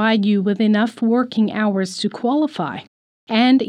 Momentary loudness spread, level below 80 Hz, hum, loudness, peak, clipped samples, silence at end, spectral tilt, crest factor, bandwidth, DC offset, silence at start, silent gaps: 7 LU; -72 dBFS; none; -19 LUFS; -4 dBFS; under 0.1%; 0 s; -6 dB/octave; 14 dB; 11 kHz; under 0.1%; 0 s; 2.88-3.27 s